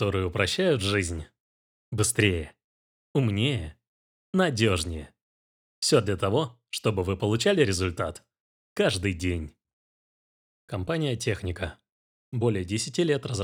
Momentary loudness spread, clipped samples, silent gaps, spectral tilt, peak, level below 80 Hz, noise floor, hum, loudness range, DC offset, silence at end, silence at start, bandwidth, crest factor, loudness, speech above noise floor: 13 LU; under 0.1%; 1.40-1.92 s, 2.64-3.14 s, 3.88-4.33 s, 5.22-5.82 s, 8.40-8.76 s, 9.73-10.68 s, 11.89-12.32 s; -5 dB/octave; -6 dBFS; -48 dBFS; under -90 dBFS; none; 5 LU; under 0.1%; 0 s; 0 s; 17 kHz; 22 dB; -27 LUFS; over 64 dB